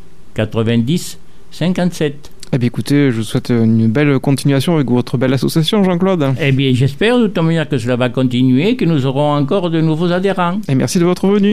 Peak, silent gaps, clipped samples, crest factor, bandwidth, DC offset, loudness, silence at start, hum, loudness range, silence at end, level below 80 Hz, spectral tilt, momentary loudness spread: -2 dBFS; none; under 0.1%; 12 dB; 15 kHz; 3%; -14 LUFS; 0.05 s; none; 3 LU; 0 s; -44 dBFS; -6.5 dB/octave; 6 LU